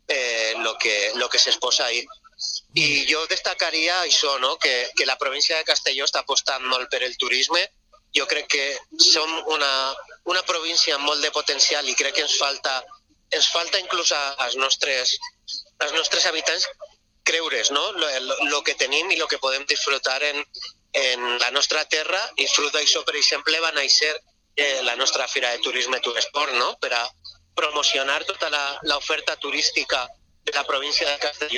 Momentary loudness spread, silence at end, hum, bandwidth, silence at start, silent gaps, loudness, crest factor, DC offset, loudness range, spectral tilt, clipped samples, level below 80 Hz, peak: 8 LU; 0 s; none; 12.5 kHz; 0.1 s; none; -21 LUFS; 22 dB; under 0.1%; 3 LU; 1 dB/octave; under 0.1%; -64 dBFS; 0 dBFS